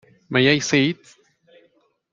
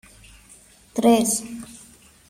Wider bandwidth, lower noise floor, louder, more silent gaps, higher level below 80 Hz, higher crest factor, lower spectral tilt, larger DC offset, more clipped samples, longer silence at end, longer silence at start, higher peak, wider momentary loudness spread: second, 7.6 kHz vs 16 kHz; first, -62 dBFS vs -51 dBFS; about the same, -19 LUFS vs -20 LUFS; neither; second, -62 dBFS vs -56 dBFS; about the same, 20 dB vs 20 dB; about the same, -4.5 dB/octave vs -3.5 dB/octave; neither; neither; first, 1.2 s vs 0.55 s; second, 0.3 s vs 0.95 s; about the same, -2 dBFS vs -4 dBFS; second, 8 LU vs 20 LU